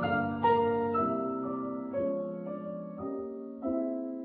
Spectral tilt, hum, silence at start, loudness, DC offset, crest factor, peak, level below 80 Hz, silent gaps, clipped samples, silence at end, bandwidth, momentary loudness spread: -10.5 dB/octave; none; 0 s; -32 LUFS; under 0.1%; 18 dB; -14 dBFS; -66 dBFS; none; under 0.1%; 0 s; 4.8 kHz; 12 LU